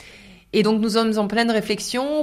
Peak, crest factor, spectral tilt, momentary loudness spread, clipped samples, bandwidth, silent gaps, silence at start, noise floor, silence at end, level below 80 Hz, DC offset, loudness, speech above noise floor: -4 dBFS; 16 dB; -4.5 dB/octave; 5 LU; under 0.1%; 15.5 kHz; none; 0 s; -46 dBFS; 0 s; -54 dBFS; under 0.1%; -21 LUFS; 26 dB